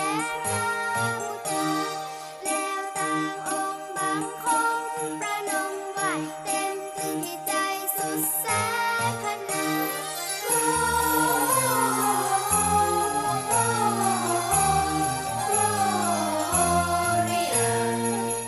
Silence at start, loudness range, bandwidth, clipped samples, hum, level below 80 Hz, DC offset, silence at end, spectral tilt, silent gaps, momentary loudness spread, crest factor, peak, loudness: 0 s; 5 LU; 13 kHz; under 0.1%; none; -52 dBFS; under 0.1%; 0 s; -3 dB/octave; none; 7 LU; 16 dB; -10 dBFS; -25 LUFS